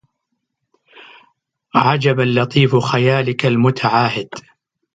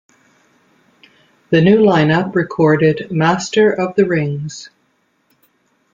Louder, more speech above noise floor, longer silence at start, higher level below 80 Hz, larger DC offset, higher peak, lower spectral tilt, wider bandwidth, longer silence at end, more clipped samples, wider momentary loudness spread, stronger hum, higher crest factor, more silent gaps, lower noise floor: about the same, -15 LUFS vs -14 LUFS; first, 59 dB vs 48 dB; first, 1.75 s vs 1.5 s; about the same, -58 dBFS vs -56 dBFS; neither; about the same, 0 dBFS vs -2 dBFS; about the same, -6.5 dB/octave vs -6.5 dB/octave; about the same, 7.8 kHz vs 7.6 kHz; second, 0.55 s vs 1.3 s; neither; second, 6 LU vs 10 LU; neither; about the same, 18 dB vs 14 dB; neither; first, -74 dBFS vs -62 dBFS